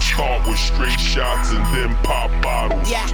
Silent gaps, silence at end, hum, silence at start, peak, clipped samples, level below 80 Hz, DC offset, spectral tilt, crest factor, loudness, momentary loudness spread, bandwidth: none; 0 s; none; 0 s; -2 dBFS; under 0.1%; -18 dBFS; under 0.1%; -4 dB/octave; 16 dB; -19 LUFS; 2 LU; 18 kHz